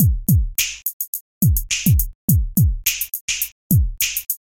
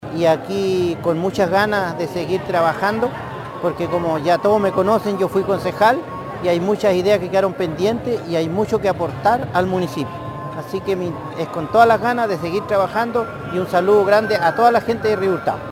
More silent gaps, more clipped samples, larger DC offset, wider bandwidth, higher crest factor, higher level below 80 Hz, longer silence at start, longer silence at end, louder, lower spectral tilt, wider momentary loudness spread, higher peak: first, 0.93-1.00 s, 1.08-1.13 s, 1.21-1.41 s, 2.15-2.28 s, 3.21-3.28 s, 3.52-3.70 s vs none; neither; neither; about the same, 17 kHz vs 17 kHz; about the same, 18 dB vs 18 dB; first, -26 dBFS vs -50 dBFS; about the same, 0 s vs 0 s; first, 0.2 s vs 0 s; about the same, -19 LUFS vs -18 LUFS; second, -3.5 dB/octave vs -6 dB/octave; second, 6 LU vs 9 LU; about the same, -2 dBFS vs 0 dBFS